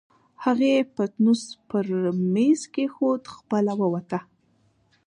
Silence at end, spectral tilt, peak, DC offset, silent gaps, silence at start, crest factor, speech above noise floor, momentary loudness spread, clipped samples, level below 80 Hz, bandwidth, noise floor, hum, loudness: 0.85 s; -6.5 dB/octave; -10 dBFS; under 0.1%; none; 0.4 s; 14 dB; 41 dB; 8 LU; under 0.1%; -72 dBFS; 10.5 kHz; -64 dBFS; none; -24 LUFS